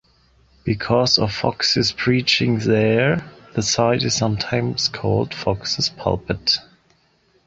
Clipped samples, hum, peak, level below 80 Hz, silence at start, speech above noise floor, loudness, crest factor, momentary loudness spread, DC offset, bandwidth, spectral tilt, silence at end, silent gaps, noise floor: under 0.1%; none; -2 dBFS; -46 dBFS; 0.65 s; 41 dB; -19 LUFS; 18 dB; 7 LU; under 0.1%; 8 kHz; -4 dB/octave; 0.85 s; none; -60 dBFS